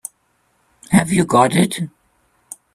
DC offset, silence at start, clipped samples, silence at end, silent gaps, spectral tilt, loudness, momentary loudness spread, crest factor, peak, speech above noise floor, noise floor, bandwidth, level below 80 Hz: under 0.1%; 0.9 s; under 0.1%; 0.85 s; none; -5 dB/octave; -16 LUFS; 22 LU; 18 dB; 0 dBFS; 48 dB; -63 dBFS; 14.5 kHz; -50 dBFS